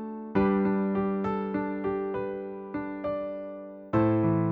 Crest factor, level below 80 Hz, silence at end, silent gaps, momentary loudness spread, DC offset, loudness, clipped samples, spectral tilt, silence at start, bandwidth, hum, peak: 16 dB; -56 dBFS; 0 s; none; 11 LU; under 0.1%; -29 LUFS; under 0.1%; -11 dB/octave; 0 s; 4.8 kHz; none; -14 dBFS